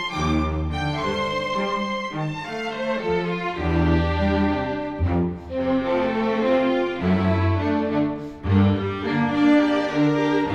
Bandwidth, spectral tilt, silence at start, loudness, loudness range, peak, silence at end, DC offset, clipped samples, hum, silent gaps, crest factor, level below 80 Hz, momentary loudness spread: 8.6 kHz; -7.5 dB/octave; 0 s; -22 LUFS; 4 LU; -8 dBFS; 0 s; under 0.1%; under 0.1%; none; none; 14 dB; -36 dBFS; 7 LU